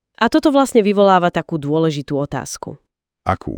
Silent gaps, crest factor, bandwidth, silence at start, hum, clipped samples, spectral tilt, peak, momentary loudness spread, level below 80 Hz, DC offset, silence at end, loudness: none; 16 dB; 19 kHz; 0.2 s; none; under 0.1%; -6 dB/octave; 0 dBFS; 14 LU; -46 dBFS; under 0.1%; 0 s; -16 LUFS